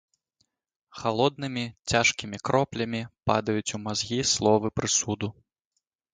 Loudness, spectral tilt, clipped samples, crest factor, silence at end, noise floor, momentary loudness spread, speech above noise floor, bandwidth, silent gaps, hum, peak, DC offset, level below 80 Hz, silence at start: -26 LUFS; -3.5 dB/octave; under 0.1%; 22 dB; 0.85 s; -81 dBFS; 10 LU; 54 dB; 10 kHz; none; none; -6 dBFS; under 0.1%; -54 dBFS; 0.95 s